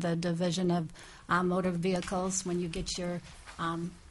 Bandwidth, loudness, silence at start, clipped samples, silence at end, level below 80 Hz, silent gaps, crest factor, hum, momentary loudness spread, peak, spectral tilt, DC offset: 11.5 kHz; -32 LUFS; 0 s; under 0.1%; 0 s; -52 dBFS; none; 18 dB; none; 10 LU; -14 dBFS; -5 dB/octave; under 0.1%